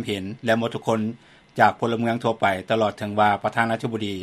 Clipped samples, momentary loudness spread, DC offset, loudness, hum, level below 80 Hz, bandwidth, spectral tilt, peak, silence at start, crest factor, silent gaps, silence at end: under 0.1%; 7 LU; under 0.1%; -23 LUFS; none; -62 dBFS; 13.5 kHz; -6 dB/octave; -2 dBFS; 0 s; 22 dB; none; 0 s